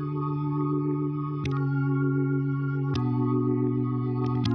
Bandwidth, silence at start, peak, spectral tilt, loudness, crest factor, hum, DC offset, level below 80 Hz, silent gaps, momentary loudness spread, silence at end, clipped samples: 6.2 kHz; 0 s; -14 dBFS; -9.5 dB/octave; -27 LUFS; 12 dB; none; under 0.1%; -54 dBFS; none; 4 LU; 0 s; under 0.1%